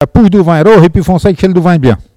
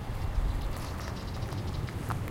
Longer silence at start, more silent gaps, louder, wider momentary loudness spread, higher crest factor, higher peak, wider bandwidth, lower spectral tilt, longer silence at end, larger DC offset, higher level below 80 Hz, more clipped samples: about the same, 0 s vs 0 s; neither; first, -7 LUFS vs -36 LUFS; about the same, 5 LU vs 3 LU; second, 6 dB vs 16 dB; first, 0 dBFS vs -18 dBFS; second, 12.5 kHz vs 17 kHz; first, -8 dB/octave vs -6 dB/octave; first, 0.15 s vs 0 s; neither; first, -26 dBFS vs -36 dBFS; first, 5% vs under 0.1%